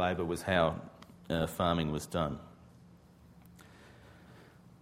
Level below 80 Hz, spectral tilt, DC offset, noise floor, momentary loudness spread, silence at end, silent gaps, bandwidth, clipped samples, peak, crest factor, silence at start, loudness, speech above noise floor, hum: -54 dBFS; -5.5 dB/octave; under 0.1%; -58 dBFS; 26 LU; 0.35 s; none; 16 kHz; under 0.1%; -14 dBFS; 22 dB; 0 s; -33 LUFS; 26 dB; none